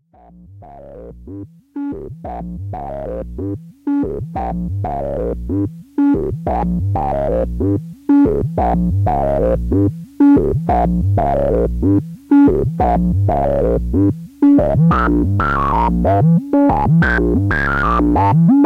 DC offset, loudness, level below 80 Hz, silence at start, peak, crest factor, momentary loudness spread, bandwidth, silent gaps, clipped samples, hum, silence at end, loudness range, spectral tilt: under 0.1%; -16 LUFS; -26 dBFS; 0.5 s; -2 dBFS; 12 dB; 14 LU; 5.4 kHz; none; under 0.1%; none; 0 s; 10 LU; -10 dB/octave